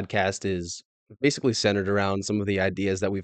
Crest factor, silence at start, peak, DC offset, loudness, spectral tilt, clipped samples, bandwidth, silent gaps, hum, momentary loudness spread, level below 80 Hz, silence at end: 18 dB; 0 s; -8 dBFS; under 0.1%; -25 LUFS; -5 dB/octave; under 0.1%; 9.2 kHz; 0.85-1.07 s; none; 7 LU; -62 dBFS; 0 s